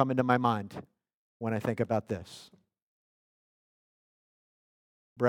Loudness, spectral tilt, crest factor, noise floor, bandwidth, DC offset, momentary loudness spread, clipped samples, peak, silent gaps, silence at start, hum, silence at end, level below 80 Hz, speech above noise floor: -31 LUFS; -7.5 dB/octave; 24 dB; under -90 dBFS; 16.5 kHz; under 0.1%; 21 LU; under 0.1%; -10 dBFS; 1.14-1.40 s, 2.82-5.16 s; 0 s; none; 0 s; -74 dBFS; over 60 dB